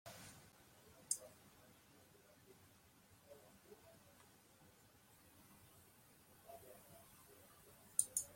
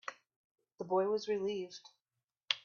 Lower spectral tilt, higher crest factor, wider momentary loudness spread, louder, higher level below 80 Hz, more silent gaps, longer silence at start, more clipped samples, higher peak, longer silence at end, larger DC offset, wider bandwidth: second, -1 dB/octave vs -4 dB/octave; first, 38 dB vs 28 dB; first, 23 LU vs 16 LU; second, -45 LUFS vs -36 LUFS; about the same, -82 dBFS vs -84 dBFS; second, none vs 0.36-0.55 s; about the same, 0.05 s vs 0.05 s; neither; second, -16 dBFS vs -12 dBFS; about the same, 0 s vs 0.05 s; neither; first, 16.5 kHz vs 7.2 kHz